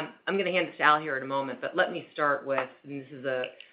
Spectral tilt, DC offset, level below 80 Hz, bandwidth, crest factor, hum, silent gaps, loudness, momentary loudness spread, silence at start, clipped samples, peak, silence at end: -8.5 dB/octave; under 0.1%; -80 dBFS; 5.2 kHz; 24 dB; none; none; -28 LUFS; 12 LU; 0 s; under 0.1%; -6 dBFS; 0.2 s